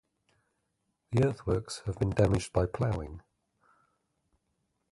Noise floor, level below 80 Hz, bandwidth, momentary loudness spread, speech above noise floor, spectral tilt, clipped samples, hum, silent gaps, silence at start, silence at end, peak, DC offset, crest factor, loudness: -80 dBFS; -48 dBFS; 11.5 kHz; 10 LU; 50 dB; -7 dB/octave; under 0.1%; none; none; 1.1 s; 1.7 s; -10 dBFS; under 0.1%; 22 dB; -31 LUFS